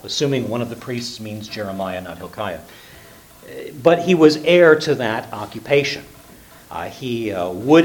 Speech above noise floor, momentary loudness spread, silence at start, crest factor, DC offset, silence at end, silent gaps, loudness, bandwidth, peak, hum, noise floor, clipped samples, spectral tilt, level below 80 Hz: 26 dB; 18 LU; 0.05 s; 20 dB; under 0.1%; 0 s; none; -18 LUFS; 19 kHz; 0 dBFS; none; -44 dBFS; under 0.1%; -5.5 dB/octave; -56 dBFS